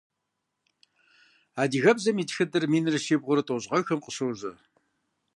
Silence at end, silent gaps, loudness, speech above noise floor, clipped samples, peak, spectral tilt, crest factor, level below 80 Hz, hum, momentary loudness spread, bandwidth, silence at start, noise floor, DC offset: 0.85 s; none; -26 LUFS; 56 dB; under 0.1%; -6 dBFS; -5 dB/octave; 22 dB; -76 dBFS; none; 10 LU; 11.5 kHz; 1.55 s; -82 dBFS; under 0.1%